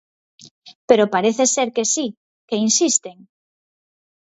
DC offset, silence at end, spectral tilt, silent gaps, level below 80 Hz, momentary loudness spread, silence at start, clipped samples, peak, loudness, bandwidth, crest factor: under 0.1%; 1.2 s; -2.5 dB/octave; 0.75-0.88 s, 2.17-2.48 s; -68 dBFS; 10 LU; 0.65 s; under 0.1%; 0 dBFS; -18 LUFS; 8.2 kHz; 20 dB